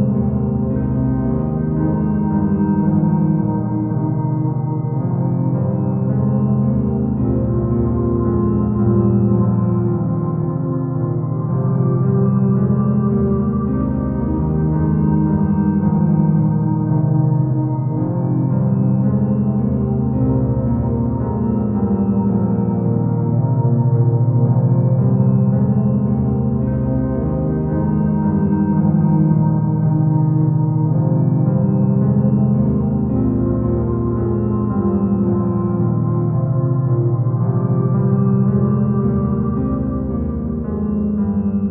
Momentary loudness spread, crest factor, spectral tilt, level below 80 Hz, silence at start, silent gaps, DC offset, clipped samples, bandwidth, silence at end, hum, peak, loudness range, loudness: 4 LU; 12 dB; -14.5 dB/octave; -34 dBFS; 0 s; none; under 0.1%; under 0.1%; 2.2 kHz; 0 s; none; -4 dBFS; 2 LU; -17 LUFS